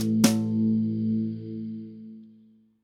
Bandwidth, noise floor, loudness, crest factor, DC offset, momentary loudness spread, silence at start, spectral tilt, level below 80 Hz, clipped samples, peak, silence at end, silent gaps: 17 kHz; -57 dBFS; -26 LUFS; 22 dB; under 0.1%; 20 LU; 0 s; -5.5 dB/octave; -66 dBFS; under 0.1%; -6 dBFS; 0.55 s; none